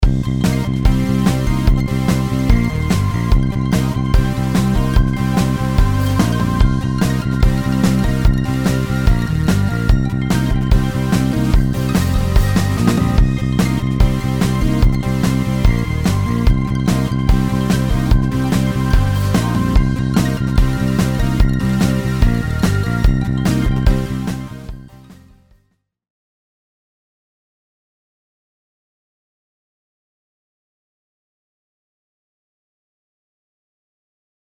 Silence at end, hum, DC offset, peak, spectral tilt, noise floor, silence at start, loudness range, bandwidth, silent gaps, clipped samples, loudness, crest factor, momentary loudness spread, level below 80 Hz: 9.4 s; none; 0.3%; 0 dBFS; -6.5 dB/octave; -63 dBFS; 0 s; 2 LU; 19.5 kHz; none; under 0.1%; -16 LUFS; 16 dB; 2 LU; -20 dBFS